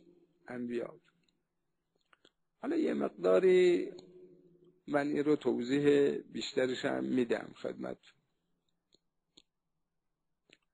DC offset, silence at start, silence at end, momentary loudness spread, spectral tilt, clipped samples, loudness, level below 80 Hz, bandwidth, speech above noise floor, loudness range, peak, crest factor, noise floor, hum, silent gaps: under 0.1%; 0.5 s; 2.8 s; 17 LU; -6 dB/octave; under 0.1%; -32 LUFS; -78 dBFS; 9.8 kHz; 55 dB; 10 LU; -16 dBFS; 20 dB; -87 dBFS; none; none